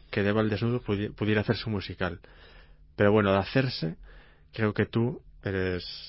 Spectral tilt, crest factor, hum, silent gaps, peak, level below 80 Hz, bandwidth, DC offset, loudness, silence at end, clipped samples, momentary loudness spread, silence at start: -10.5 dB/octave; 18 dB; none; none; -10 dBFS; -48 dBFS; 5.8 kHz; under 0.1%; -28 LUFS; 0 s; under 0.1%; 12 LU; 0.1 s